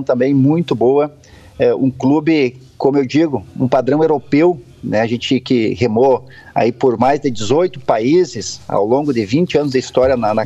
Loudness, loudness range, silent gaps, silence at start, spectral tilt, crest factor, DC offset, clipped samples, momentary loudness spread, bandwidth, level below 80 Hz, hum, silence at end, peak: -15 LUFS; 1 LU; none; 0 s; -6.5 dB/octave; 14 dB; under 0.1%; under 0.1%; 6 LU; 8.2 kHz; -50 dBFS; none; 0 s; 0 dBFS